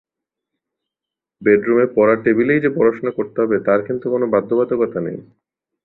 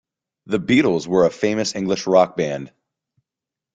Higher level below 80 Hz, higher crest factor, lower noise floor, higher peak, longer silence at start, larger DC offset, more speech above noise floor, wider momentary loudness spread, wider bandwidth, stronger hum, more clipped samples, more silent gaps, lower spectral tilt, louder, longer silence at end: about the same, -60 dBFS vs -58 dBFS; about the same, 16 dB vs 18 dB; about the same, -86 dBFS vs -87 dBFS; about the same, -2 dBFS vs -2 dBFS; first, 1.4 s vs 0.45 s; neither; about the same, 69 dB vs 69 dB; about the same, 8 LU vs 9 LU; second, 4.1 kHz vs 9.2 kHz; neither; neither; neither; first, -11 dB/octave vs -5 dB/octave; about the same, -17 LUFS vs -19 LUFS; second, 0.6 s vs 1.1 s